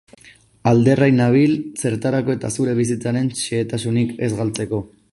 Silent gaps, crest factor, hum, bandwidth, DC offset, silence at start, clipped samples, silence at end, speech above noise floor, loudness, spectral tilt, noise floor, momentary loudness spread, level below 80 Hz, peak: none; 16 dB; none; 11.5 kHz; under 0.1%; 0.65 s; under 0.1%; 0.25 s; 31 dB; -19 LUFS; -6.5 dB/octave; -49 dBFS; 9 LU; -52 dBFS; -2 dBFS